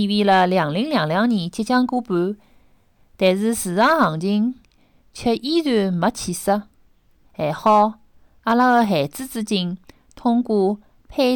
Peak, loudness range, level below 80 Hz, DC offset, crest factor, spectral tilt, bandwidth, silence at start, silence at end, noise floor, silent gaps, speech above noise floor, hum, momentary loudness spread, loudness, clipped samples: -6 dBFS; 2 LU; -54 dBFS; under 0.1%; 14 dB; -5.5 dB/octave; 19 kHz; 0 s; 0 s; -56 dBFS; none; 37 dB; none; 10 LU; -20 LUFS; under 0.1%